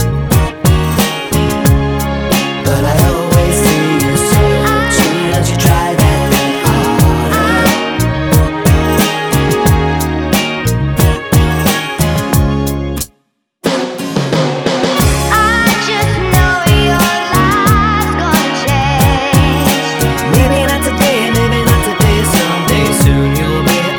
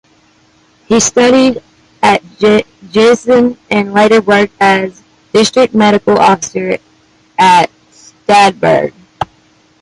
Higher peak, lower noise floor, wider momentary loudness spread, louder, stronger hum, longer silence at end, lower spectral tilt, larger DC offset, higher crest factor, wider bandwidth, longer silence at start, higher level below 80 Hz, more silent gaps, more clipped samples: about the same, 0 dBFS vs 0 dBFS; first, -60 dBFS vs -49 dBFS; second, 4 LU vs 14 LU; about the same, -11 LUFS vs -10 LUFS; neither; second, 0 s vs 0.55 s; about the same, -5 dB/octave vs -4 dB/octave; neither; about the same, 12 dB vs 10 dB; first, over 20 kHz vs 11.5 kHz; second, 0 s vs 0.9 s; first, -20 dBFS vs -48 dBFS; neither; neither